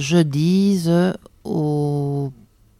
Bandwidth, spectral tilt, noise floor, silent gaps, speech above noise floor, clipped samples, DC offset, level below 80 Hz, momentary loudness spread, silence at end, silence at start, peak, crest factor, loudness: 14.5 kHz; -7 dB/octave; -45 dBFS; none; 28 dB; under 0.1%; under 0.1%; -54 dBFS; 10 LU; 0.45 s; 0 s; -2 dBFS; 16 dB; -19 LUFS